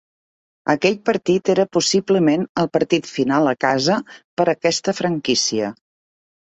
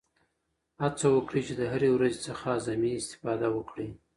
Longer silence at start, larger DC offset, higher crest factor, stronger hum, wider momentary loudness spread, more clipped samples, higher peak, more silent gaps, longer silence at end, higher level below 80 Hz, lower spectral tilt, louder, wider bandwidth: second, 0.65 s vs 0.8 s; neither; about the same, 18 dB vs 16 dB; neither; second, 5 LU vs 9 LU; neither; first, -2 dBFS vs -12 dBFS; first, 2.49-2.55 s, 4.24-4.37 s vs none; first, 0.75 s vs 0.2 s; about the same, -60 dBFS vs -60 dBFS; second, -4 dB/octave vs -5.5 dB/octave; first, -19 LUFS vs -29 LUFS; second, 8.2 kHz vs 11.5 kHz